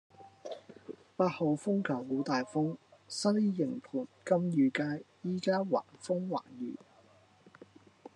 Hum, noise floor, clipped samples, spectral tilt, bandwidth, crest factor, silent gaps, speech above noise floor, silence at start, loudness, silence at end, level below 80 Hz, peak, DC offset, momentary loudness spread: none; -63 dBFS; under 0.1%; -6.5 dB/octave; 11 kHz; 20 dB; none; 31 dB; 0.2 s; -33 LUFS; 1.4 s; -88 dBFS; -14 dBFS; under 0.1%; 17 LU